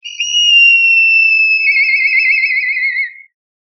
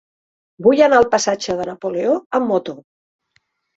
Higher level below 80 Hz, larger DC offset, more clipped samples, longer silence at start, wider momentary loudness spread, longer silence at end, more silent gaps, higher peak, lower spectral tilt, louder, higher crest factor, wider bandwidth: second, under -90 dBFS vs -56 dBFS; neither; neither; second, 0.05 s vs 0.6 s; about the same, 9 LU vs 11 LU; second, 0.6 s vs 0.95 s; second, none vs 2.26-2.30 s; about the same, -2 dBFS vs -2 dBFS; second, 19.5 dB/octave vs -4 dB/octave; first, -8 LUFS vs -17 LUFS; second, 10 dB vs 18 dB; second, 6.2 kHz vs 8 kHz